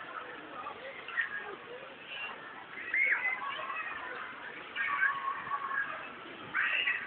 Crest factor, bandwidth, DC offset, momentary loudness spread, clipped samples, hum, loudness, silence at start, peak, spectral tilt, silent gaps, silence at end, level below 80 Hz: 18 dB; 4.5 kHz; under 0.1%; 15 LU; under 0.1%; none; -34 LUFS; 0 s; -18 dBFS; 1.5 dB/octave; none; 0 s; -78 dBFS